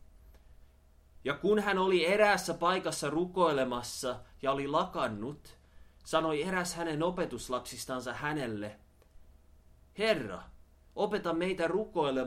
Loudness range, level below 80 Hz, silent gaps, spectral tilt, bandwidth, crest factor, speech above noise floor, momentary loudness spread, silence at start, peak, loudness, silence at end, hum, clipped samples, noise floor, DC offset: 8 LU; -58 dBFS; none; -4.5 dB/octave; 16.5 kHz; 22 dB; 29 dB; 12 LU; 0.25 s; -12 dBFS; -32 LUFS; 0 s; none; under 0.1%; -61 dBFS; under 0.1%